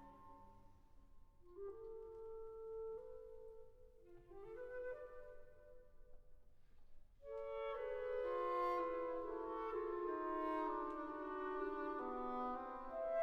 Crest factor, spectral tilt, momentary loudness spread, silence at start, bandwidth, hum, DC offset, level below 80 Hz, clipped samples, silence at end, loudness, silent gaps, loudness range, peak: 16 dB; -7 dB/octave; 21 LU; 0 s; 8.2 kHz; none; under 0.1%; -66 dBFS; under 0.1%; 0 s; -46 LUFS; none; 13 LU; -32 dBFS